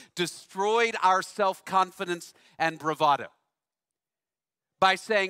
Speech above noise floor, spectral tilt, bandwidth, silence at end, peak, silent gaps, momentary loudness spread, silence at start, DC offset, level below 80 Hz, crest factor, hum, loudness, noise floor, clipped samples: over 64 dB; -3 dB/octave; 16 kHz; 0 s; -8 dBFS; none; 11 LU; 0.15 s; under 0.1%; -76 dBFS; 20 dB; none; -26 LUFS; under -90 dBFS; under 0.1%